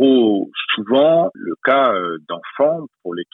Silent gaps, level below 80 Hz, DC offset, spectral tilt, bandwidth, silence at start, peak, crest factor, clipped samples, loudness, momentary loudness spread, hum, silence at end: none; -70 dBFS; under 0.1%; -8.5 dB/octave; 4 kHz; 0 s; -2 dBFS; 14 dB; under 0.1%; -17 LUFS; 14 LU; none; 0.1 s